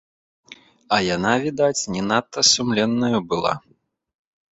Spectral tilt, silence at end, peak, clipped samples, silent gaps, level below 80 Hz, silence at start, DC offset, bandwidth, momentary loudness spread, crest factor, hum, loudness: -3 dB/octave; 1 s; -2 dBFS; under 0.1%; none; -56 dBFS; 0.5 s; under 0.1%; 8.2 kHz; 7 LU; 20 dB; none; -20 LUFS